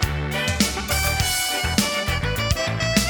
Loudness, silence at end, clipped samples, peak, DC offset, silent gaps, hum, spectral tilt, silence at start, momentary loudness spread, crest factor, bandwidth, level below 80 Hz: -21 LUFS; 0 s; under 0.1%; -2 dBFS; under 0.1%; none; none; -3.5 dB/octave; 0 s; 3 LU; 20 dB; over 20 kHz; -32 dBFS